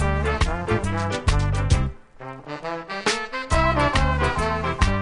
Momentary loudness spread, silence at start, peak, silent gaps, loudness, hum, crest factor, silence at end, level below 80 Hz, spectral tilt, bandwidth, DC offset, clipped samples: 12 LU; 0 s; -4 dBFS; none; -23 LUFS; none; 18 dB; 0 s; -28 dBFS; -5 dB/octave; 10.5 kHz; under 0.1%; under 0.1%